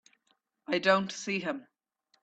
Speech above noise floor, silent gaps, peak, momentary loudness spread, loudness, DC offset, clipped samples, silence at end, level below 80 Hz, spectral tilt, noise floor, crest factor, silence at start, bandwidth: 45 dB; none; -10 dBFS; 15 LU; -30 LUFS; under 0.1%; under 0.1%; 0.6 s; -80 dBFS; -4 dB/octave; -75 dBFS; 24 dB; 0.7 s; 8.6 kHz